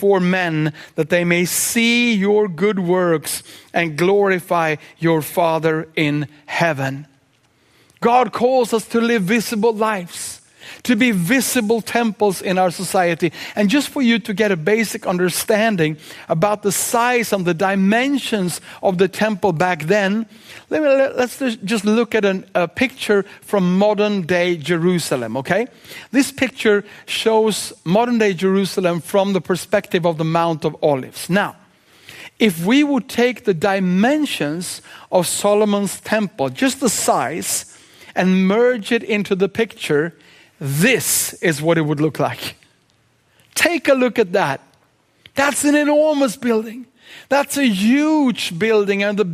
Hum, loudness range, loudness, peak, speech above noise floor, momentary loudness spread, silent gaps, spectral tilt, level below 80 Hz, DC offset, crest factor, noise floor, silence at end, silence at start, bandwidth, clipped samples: none; 2 LU; -18 LUFS; 0 dBFS; 42 dB; 8 LU; none; -4.5 dB/octave; -62 dBFS; under 0.1%; 18 dB; -59 dBFS; 0 s; 0 s; 15.5 kHz; under 0.1%